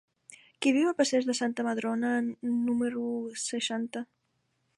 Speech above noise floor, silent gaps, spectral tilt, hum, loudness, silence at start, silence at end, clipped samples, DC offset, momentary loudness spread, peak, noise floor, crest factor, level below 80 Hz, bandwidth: 47 dB; none; -3 dB/octave; none; -29 LUFS; 0.3 s; 0.75 s; under 0.1%; under 0.1%; 8 LU; -14 dBFS; -76 dBFS; 16 dB; -76 dBFS; 11.5 kHz